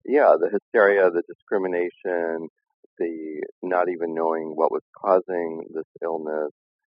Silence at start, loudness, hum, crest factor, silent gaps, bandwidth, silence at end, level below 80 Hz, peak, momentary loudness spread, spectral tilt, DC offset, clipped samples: 0.05 s; -24 LUFS; none; 20 dB; 0.62-0.72 s, 1.35-1.47 s, 2.50-2.56 s, 2.74-2.97 s, 3.52-3.62 s, 4.81-4.93 s, 5.84-5.95 s; 5.2 kHz; 0.35 s; -82 dBFS; -4 dBFS; 15 LU; -4.5 dB/octave; under 0.1%; under 0.1%